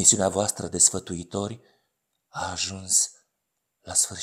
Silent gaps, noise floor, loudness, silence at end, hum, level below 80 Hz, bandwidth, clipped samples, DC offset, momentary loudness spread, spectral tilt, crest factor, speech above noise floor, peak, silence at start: none; -80 dBFS; -23 LUFS; 0 s; none; -62 dBFS; 16.5 kHz; under 0.1%; under 0.1%; 15 LU; -2 dB/octave; 24 dB; 55 dB; -4 dBFS; 0 s